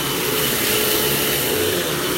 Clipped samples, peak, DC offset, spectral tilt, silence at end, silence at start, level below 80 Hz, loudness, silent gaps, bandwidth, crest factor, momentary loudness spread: under 0.1%; -6 dBFS; under 0.1%; -2.5 dB/octave; 0 s; 0 s; -44 dBFS; -18 LUFS; none; 16 kHz; 14 dB; 3 LU